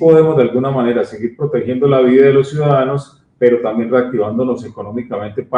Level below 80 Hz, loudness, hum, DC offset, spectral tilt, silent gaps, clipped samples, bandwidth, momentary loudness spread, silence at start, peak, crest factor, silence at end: -54 dBFS; -14 LUFS; none; under 0.1%; -8.5 dB/octave; none; under 0.1%; 9.6 kHz; 13 LU; 0 s; 0 dBFS; 14 dB; 0 s